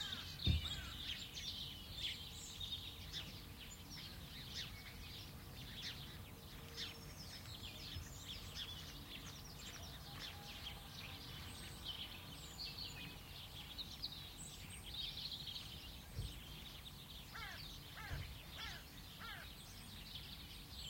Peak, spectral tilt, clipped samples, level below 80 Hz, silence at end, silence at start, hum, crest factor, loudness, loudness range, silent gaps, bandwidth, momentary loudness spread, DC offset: -24 dBFS; -3 dB/octave; under 0.1%; -58 dBFS; 0 s; 0 s; none; 26 dB; -49 LUFS; 4 LU; none; 16.5 kHz; 7 LU; under 0.1%